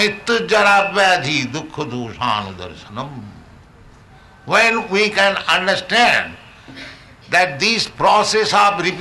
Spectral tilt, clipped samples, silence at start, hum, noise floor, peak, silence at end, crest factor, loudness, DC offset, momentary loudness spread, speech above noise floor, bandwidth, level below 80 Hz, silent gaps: -3 dB/octave; under 0.1%; 0 s; none; -44 dBFS; -4 dBFS; 0 s; 14 dB; -15 LUFS; under 0.1%; 18 LU; 28 dB; 12 kHz; -50 dBFS; none